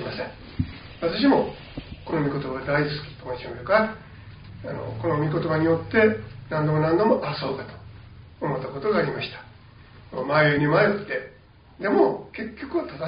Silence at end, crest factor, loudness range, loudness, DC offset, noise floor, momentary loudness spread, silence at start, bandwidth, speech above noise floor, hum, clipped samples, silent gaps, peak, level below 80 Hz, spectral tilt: 0 s; 20 dB; 4 LU; -24 LUFS; under 0.1%; -50 dBFS; 18 LU; 0 s; 5.2 kHz; 27 dB; none; under 0.1%; none; -6 dBFS; -50 dBFS; -5 dB/octave